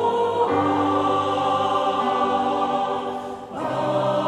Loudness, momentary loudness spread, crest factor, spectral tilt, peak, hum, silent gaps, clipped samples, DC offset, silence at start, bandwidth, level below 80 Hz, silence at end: -22 LUFS; 7 LU; 14 dB; -6 dB/octave; -8 dBFS; none; none; under 0.1%; under 0.1%; 0 s; 12.5 kHz; -60 dBFS; 0 s